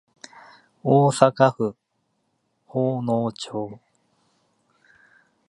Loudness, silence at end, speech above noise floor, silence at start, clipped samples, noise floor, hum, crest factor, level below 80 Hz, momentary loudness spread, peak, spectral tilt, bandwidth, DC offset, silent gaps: -22 LUFS; 1.75 s; 52 dB; 0.85 s; under 0.1%; -72 dBFS; none; 24 dB; -68 dBFS; 14 LU; 0 dBFS; -6.5 dB/octave; 11.5 kHz; under 0.1%; none